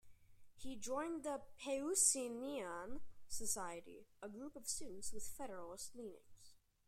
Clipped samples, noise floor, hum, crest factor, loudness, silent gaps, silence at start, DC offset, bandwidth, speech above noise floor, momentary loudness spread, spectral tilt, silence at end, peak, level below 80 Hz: under 0.1%; -66 dBFS; none; 24 dB; -42 LUFS; none; 0.05 s; under 0.1%; 16 kHz; 23 dB; 20 LU; -1.5 dB/octave; 0.3 s; -20 dBFS; -66 dBFS